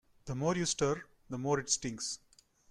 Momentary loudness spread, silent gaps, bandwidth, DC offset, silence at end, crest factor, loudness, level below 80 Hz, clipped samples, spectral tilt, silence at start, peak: 11 LU; none; 13 kHz; under 0.1%; 0.55 s; 20 dB; -34 LUFS; -60 dBFS; under 0.1%; -3.5 dB/octave; 0.25 s; -16 dBFS